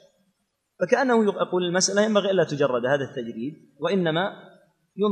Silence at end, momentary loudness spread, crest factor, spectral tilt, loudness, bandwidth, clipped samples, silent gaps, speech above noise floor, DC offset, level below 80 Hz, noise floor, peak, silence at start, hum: 0 s; 11 LU; 20 dB; -4 dB/octave; -23 LUFS; 10.5 kHz; under 0.1%; none; 51 dB; under 0.1%; -76 dBFS; -74 dBFS; -6 dBFS; 0.8 s; none